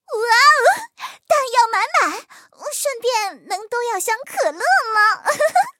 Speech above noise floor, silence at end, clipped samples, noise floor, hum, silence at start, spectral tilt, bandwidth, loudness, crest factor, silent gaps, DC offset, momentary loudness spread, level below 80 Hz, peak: 19 dB; 0.1 s; under 0.1%; -38 dBFS; none; 0.1 s; 1 dB/octave; 17 kHz; -17 LUFS; 18 dB; none; under 0.1%; 15 LU; -80 dBFS; -2 dBFS